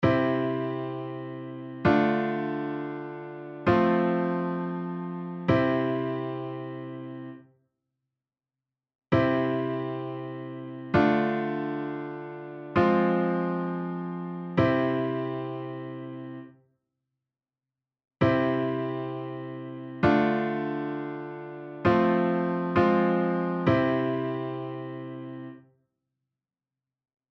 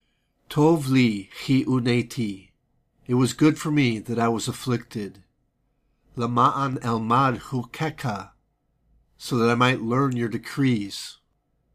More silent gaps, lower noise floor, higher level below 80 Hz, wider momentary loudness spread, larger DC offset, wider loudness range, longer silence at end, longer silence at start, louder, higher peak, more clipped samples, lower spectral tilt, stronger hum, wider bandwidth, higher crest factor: first, 8.95-8.99 s vs none; first, under -90 dBFS vs -70 dBFS; about the same, -56 dBFS vs -58 dBFS; about the same, 15 LU vs 13 LU; neither; first, 6 LU vs 2 LU; first, 1.75 s vs 0.6 s; second, 0 s vs 0.5 s; second, -27 LUFS vs -23 LUFS; second, -10 dBFS vs -6 dBFS; neither; first, -9 dB/octave vs -6 dB/octave; neither; second, 6.2 kHz vs 15.5 kHz; about the same, 18 dB vs 18 dB